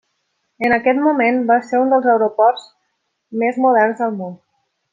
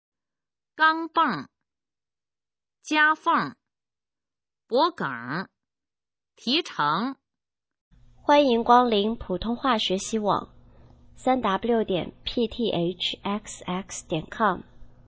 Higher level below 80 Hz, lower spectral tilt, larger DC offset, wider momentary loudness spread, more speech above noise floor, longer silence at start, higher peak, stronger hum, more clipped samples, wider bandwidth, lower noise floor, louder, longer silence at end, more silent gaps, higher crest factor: second, -62 dBFS vs -54 dBFS; first, -7 dB/octave vs -4 dB/octave; neither; about the same, 11 LU vs 13 LU; second, 55 dB vs over 66 dB; second, 0.6 s vs 0.75 s; about the same, -2 dBFS vs -4 dBFS; neither; neither; about the same, 7.6 kHz vs 8 kHz; second, -71 dBFS vs under -90 dBFS; first, -16 LUFS vs -25 LUFS; first, 0.6 s vs 0.2 s; second, none vs 7.81-7.91 s; second, 16 dB vs 22 dB